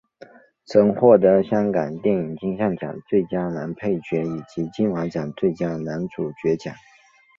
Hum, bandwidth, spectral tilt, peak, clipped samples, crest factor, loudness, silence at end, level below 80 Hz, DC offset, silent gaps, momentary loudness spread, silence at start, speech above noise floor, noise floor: none; 7.4 kHz; -8.5 dB/octave; -2 dBFS; under 0.1%; 20 dB; -22 LUFS; 0.6 s; -58 dBFS; under 0.1%; none; 13 LU; 0.7 s; 27 dB; -48 dBFS